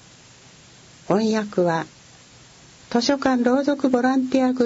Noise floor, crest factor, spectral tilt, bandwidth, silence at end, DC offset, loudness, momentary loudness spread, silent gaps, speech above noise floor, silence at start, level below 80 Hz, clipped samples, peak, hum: -48 dBFS; 18 dB; -5.5 dB/octave; 8 kHz; 0 s; under 0.1%; -21 LUFS; 5 LU; none; 29 dB; 1.1 s; -60 dBFS; under 0.1%; -4 dBFS; none